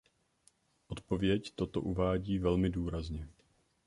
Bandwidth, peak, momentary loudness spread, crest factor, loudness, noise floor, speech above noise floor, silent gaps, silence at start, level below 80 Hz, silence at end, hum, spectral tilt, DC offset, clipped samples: 11 kHz; -16 dBFS; 14 LU; 18 dB; -34 LUFS; -72 dBFS; 38 dB; none; 0.9 s; -48 dBFS; 0.55 s; none; -7.5 dB/octave; under 0.1%; under 0.1%